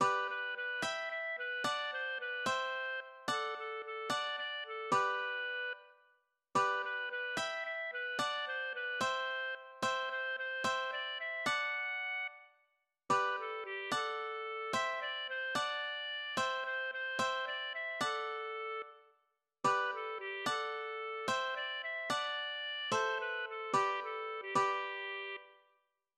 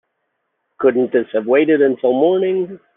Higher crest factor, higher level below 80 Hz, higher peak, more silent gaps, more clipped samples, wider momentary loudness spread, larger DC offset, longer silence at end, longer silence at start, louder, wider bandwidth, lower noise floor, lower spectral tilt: about the same, 18 dB vs 14 dB; second, -82 dBFS vs -68 dBFS; second, -20 dBFS vs -2 dBFS; neither; neither; first, 7 LU vs 4 LU; neither; first, 0.65 s vs 0.2 s; second, 0 s vs 0.8 s; second, -37 LUFS vs -16 LUFS; first, 14.5 kHz vs 3.8 kHz; first, -79 dBFS vs -72 dBFS; second, -2 dB/octave vs -9.5 dB/octave